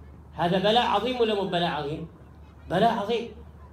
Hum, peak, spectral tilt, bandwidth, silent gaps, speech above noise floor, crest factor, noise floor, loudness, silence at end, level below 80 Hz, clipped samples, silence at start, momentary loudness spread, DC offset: none; -10 dBFS; -6 dB/octave; 13.5 kHz; none; 22 dB; 16 dB; -47 dBFS; -25 LUFS; 0.05 s; -50 dBFS; under 0.1%; 0 s; 16 LU; under 0.1%